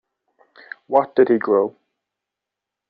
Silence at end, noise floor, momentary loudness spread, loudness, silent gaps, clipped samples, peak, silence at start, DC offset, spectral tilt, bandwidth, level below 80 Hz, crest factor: 1.2 s; -85 dBFS; 20 LU; -18 LUFS; none; under 0.1%; -2 dBFS; 0.9 s; under 0.1%; -5.5 dB/octave; 4.8 kHz; -68 dBFS; 20 dB